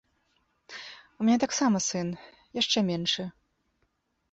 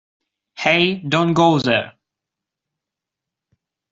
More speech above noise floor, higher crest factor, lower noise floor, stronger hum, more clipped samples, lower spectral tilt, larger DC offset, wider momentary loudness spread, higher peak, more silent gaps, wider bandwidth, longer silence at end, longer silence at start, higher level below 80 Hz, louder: second, 48 dB vs 68 dB; about the same, 18 dB vs 20 dB; second, -75 dBFS vs -85 dBFS; neither; neither; second, -3.5 dB/octave vs -5.5 dB/octave; neither; first, 18 LU vs 7 LU; second, -12 dBFS vs -2 dBFS; neither; about the same, 8.2 kHz vs 7.8 kHz; second, 1 s vs 2 s; first, 0.7 s vs 0.55 s; second, -68 dBFS vs -60 dBFS; second, -27 LUFS vs -17 LUFS